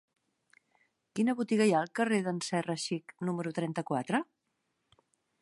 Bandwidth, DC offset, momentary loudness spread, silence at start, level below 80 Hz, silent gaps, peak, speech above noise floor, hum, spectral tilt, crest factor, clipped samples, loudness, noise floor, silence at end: 11.5 kHz; under 0.1%; 9 LU; 1.15 s; -80 dBFS; none; -16 dBFS; 50 dB; none; -5.5 dB/octave; 18 dB; under 0.1%; -32 LUFS; -81 dBFS; 1.2 s